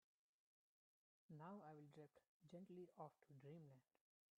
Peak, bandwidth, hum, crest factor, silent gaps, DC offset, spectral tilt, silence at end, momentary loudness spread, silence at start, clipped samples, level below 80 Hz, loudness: -46 dBFS; 4.9 kHz; none; 20 dB; 2.28-2.40 s; under 0.1%; -7.5 dB/octave; 0.6 s; 7 LU; 1.3 s; under 0.1%; under -90 dBFS; -63 LUFS